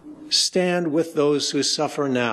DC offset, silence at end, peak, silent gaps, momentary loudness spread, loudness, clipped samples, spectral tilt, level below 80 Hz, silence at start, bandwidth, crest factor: under 0.1%; 0 s; -8 dBFS; none; 4 LU; -21 LUFS; under 0.1%; -3.5 dB/octave; -70 dBFS; 0.05 s; 13 kHz; 14 dB